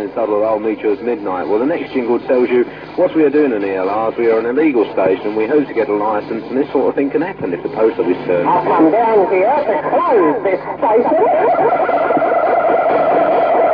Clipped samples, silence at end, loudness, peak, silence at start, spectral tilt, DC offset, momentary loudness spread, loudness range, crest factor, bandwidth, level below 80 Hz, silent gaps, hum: under 0.1%; 0 s; -15 LUFS; -2 dBFS; 0 s; -9 dB/octave; under 0.1%; 6 LU; 3 LU; 12 dB; 5.2 kHz; -54 dBFS; none; none